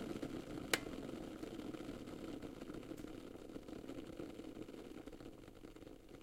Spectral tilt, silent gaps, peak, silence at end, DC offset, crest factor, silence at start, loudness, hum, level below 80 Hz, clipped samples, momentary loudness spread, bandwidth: -4 dB/octave; none; -16 dBFS; 0 s; under 0.1%; 32 dB; 0 s; -49 LUFS; none; -64 dBFS; under 0.1%; 16 LU; 16 kHz